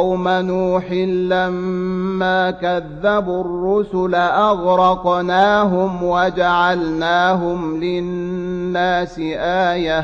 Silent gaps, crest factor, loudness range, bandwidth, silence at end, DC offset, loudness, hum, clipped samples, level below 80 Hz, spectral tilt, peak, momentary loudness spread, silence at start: none; 14 dB; 3 LU; 7.2 kHz; 0 s; under 0.1%; -17 LUFS; none; under 0.1%; -42 dBFS; -6.5 dB/octave; -2 dBFS; 7 LU; 0 s